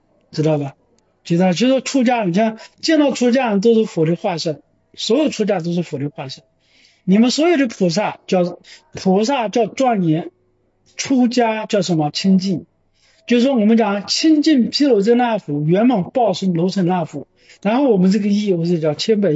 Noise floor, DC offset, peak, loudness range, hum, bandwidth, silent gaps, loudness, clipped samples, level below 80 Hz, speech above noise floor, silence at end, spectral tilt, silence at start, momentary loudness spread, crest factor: -61 dBFS; under 0.1%; -4 dBFS; 4 LU; none; 8 kHz; none; -17 LUFS; under 0.1%; -66 dBFS; 45 dB; 0 s; -6 dB/octave; 0.35 s; 12 LU; 14 dB